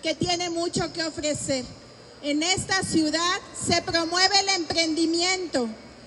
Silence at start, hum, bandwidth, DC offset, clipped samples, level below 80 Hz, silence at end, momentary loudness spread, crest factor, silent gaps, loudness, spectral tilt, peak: 0 s; none; 11.5 kHz; under 0.1%; under 0.1%; -54 dBFS; 0 s; 9 LU; 18 dB; none; -24 LUFS; -2.5 dB/octave; -8 dBFS